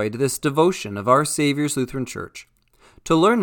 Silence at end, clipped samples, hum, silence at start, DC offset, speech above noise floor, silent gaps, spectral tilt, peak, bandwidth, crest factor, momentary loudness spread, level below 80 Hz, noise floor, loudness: 0 s; under 0.1%; none; 0 s; under 0.1%; 34 dB; none; -5 dB/octave; -2 dBFS; 19 kHz; 18 dB; 17 LU; -52 dBFS; -54 dBFS; -21 LUFS